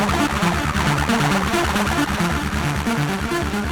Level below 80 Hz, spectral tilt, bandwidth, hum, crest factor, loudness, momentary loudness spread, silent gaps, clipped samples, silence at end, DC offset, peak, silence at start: -30 dBFS; -5 dB/octave; over 20 kHz; none; 14 dB; -20 LUFS; 4 LU; none; under 0.1%; 0 s; under 0.1%; -6 dBFS; 0 s